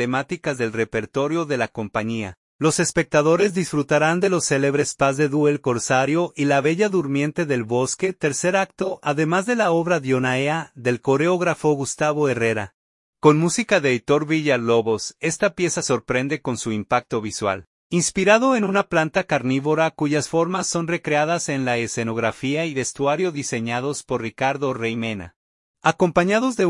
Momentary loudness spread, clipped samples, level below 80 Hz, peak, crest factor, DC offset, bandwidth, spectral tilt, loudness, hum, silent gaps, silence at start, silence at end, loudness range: 7 LU; under 0.1%; -58 dBFS; -2 dBFS; 20 dB; under 0.1%; 11.5 kHz; -5 dB/octave; -21 LUFS; none; 2.37-2.59 s, 12.74-13.13 s, 17.67-17.90 s, 25.36-25.74 s; 0 s; 0 s; 4 LU